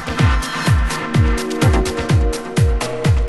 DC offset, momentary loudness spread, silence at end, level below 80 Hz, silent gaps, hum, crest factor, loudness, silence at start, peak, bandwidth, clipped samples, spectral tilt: under 0.1%; 3 LU; 0 s; -20 dBFS; none; none; 14 dB; -17 LUFS; 0 s; -2 dBFS; 12.5 kHz; under 0.1%; -5.5 dB/octave